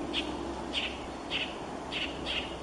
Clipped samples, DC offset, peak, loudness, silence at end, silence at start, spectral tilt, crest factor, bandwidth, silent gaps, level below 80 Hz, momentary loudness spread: under 0.1%; under 0.1%; -20 dBFS; -34 LUFS; 0 s; 0 s; -3.5 dB/octave; 16 dB; 11.5 kHz; none; -50 dBFS; 4 LU